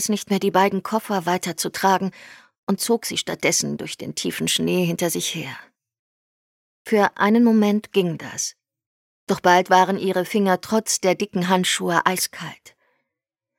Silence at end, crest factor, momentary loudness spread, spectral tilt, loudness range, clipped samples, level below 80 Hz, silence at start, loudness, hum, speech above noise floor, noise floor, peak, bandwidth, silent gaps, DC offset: 1.05 s; 20 dB; 10 LU; -4 dB/octave; 4 LU; under 0.1%; -66 dBFS; 0 s; -21 LUFS; none; 64 dB; -85 dBFS; -2 dBFS; 17 kHz; 2.58-2.67 s, 5.99-6.85 s, 8.86-9.27 s; under 0.1%